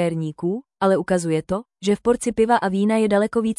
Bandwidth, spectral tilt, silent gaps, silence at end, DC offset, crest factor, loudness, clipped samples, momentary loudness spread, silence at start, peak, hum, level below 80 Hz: 12 kHz; -6 dB/octave; none; 0.05 s; under 0.1%; 16 dB; -21 LUFS; under 0.1%; 7 LU; 0 s; -6 dBFS; none; -52 dBFS